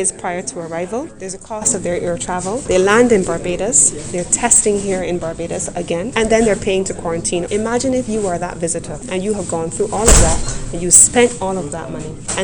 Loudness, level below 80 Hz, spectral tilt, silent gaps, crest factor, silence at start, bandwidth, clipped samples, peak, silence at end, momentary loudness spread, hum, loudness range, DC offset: -15 LUFS; -28 dBFS; -3.5 dB/octave; none; 16 dB; 0 s; 16 kHz; under 0.1%; 0 dBFS; 0 s; 13 LU; none; 5 LU; under 0.1%